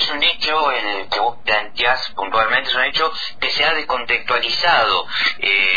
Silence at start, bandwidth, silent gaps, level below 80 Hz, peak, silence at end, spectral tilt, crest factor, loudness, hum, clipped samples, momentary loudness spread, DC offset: 0 s; 5 kHz; none; -46 dBFS; -4 dBFS; 0 s; -2 dB/octave; 14 dB; -17 LUFS; none; under 0.1%; 6 LU; 3%